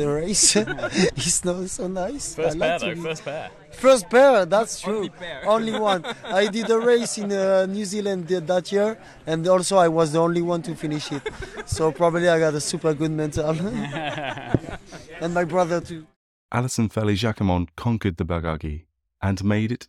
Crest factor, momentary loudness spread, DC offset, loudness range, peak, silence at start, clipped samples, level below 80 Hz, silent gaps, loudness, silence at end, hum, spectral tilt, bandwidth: 18 dB; 12 LU; under 0.1%; 5 LU; -4 dBFS; 0 s; under 0.1%; -46 dBFS; 16.16-16.49 s; -22 LUFS; 0.05 s; none; -4.5 dB/octave; 13 kHz